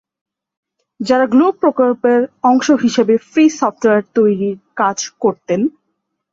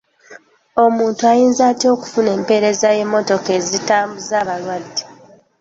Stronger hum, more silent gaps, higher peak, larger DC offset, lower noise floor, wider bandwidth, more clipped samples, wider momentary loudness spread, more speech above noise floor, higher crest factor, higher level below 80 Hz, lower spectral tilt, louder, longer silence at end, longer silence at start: neither; neither; about the same, -2 dBFS vs -2 dBFS; neither; first, -71 dBFS vs -45 dBFS; about the same, 7.8 kHz vs 8 kHz; neither; second, 6 LU vs 10 LU; first, 58 dB vs 30 dB; about the same, 14 dB vs 14 dB; about the same, -60 dBFS vs -60 dBFS; first, -5 dB/octave vs -3.5 dB/octave; about the same, -14 LUFS vs -16 LUFS; first, 0.65 s vs 0.5 s; first, 1 s vs 0.3 s